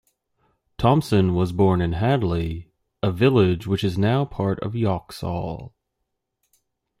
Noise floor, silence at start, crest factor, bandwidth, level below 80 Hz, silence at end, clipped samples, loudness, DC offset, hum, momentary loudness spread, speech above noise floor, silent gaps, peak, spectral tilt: -78 dBFS; 0.8 s; 20 dB; 14.5 kHz; -46 dBFS; 1.3 s; under 0.1%; -22 LUFS; under 0.1%; none; 11 LU; 57 dB; none; -4 dBFS; -8 dB/octave